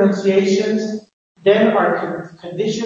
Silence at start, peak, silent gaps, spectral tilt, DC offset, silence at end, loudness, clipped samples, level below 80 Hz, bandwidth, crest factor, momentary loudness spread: 0 s; -2 dBFS; 1.13-1.35 s; -6 dB/octave; under 0.1%; 0 s; -17 LUFS; under 0.1%; -64 dBFS; 7.6 kHz; 16 dB; 15 LU